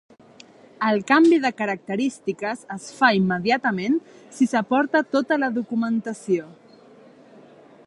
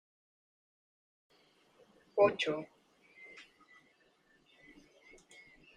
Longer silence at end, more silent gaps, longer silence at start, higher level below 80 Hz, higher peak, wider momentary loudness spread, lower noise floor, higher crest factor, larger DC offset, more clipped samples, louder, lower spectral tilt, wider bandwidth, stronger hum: second, 1.35 s vs 2.35 s; neither; second, 0.8 s vs 2.15 s; first, -66 dBFS vs -78 dBFS; first, -4 dBFS vs -14 dBFS; second, 10 LU vs 28 LU; second, -49 dBFS vs -70 dBFS; second, 20 dB vs 26 dB; neither; neither; first, -22 LUFS vs -32 LUFS; about the same, -5.5 dB/octave vs -4.5 dB/octave; first, 11.5 kHz vs 9.8 kHz; neither